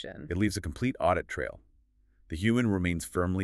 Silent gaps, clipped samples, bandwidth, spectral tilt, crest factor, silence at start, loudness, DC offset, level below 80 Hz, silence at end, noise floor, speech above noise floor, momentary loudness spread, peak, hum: none; under 0.1%; 13.5 kHz; -6 dB/octave; 18 dB; 0 s; -30 LUFS; under 0.1%; -48 dBFS; 0 s; -65 dBFS; 36 dB; 9 LU; -12 dBFS; none